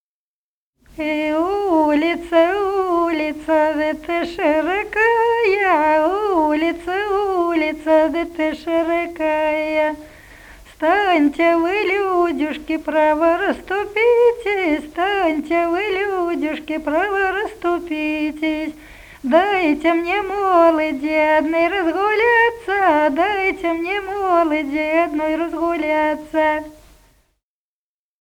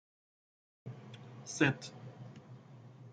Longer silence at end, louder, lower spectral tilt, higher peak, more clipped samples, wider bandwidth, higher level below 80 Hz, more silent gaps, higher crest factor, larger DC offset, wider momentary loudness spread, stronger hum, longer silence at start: first, 1.5 s vs 0 s; first, -18 LUFS vs -35 LUFS; about the same, -4.5 dB/octave vs -5 dB/octave; first, 0 dBFS vs -12 dBFS; neither; first, 18.5 kHz vs 9.4 kHz; first, -48 dBFS vs -74 dBFS; neither; second, 18 dB vs 28 dB; neither; second, 7 LU vs 23 LU; neither; about the same, 0.95 s vs 0.85 s